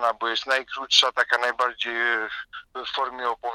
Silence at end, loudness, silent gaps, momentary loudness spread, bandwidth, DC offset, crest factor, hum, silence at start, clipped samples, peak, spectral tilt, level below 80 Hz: 0 s; -23 LUFS; none; 14 LU; 16 kHz; under 0.1%; 24 dB; none; 0 s; under 0.1%; -2 dBFS; 1 dB/octave; -66 dBFS